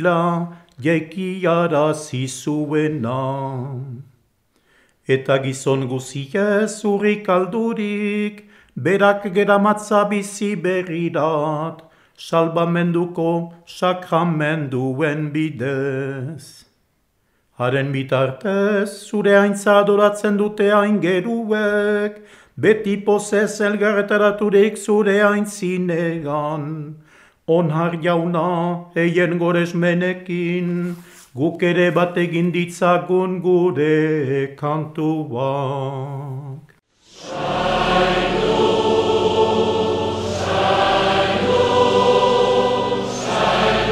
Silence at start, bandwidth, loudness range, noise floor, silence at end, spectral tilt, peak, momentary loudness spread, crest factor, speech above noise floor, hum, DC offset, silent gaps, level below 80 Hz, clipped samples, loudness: 0 s; 14 kHz; 6 LU; -65 dBFS; 0 s; -6 dB/octave; -2 dBFS; 10 LU; 18 dB; 47 dB; none; under 0.1%; none; -48 dBFS; under 0.1%; -19 LUFS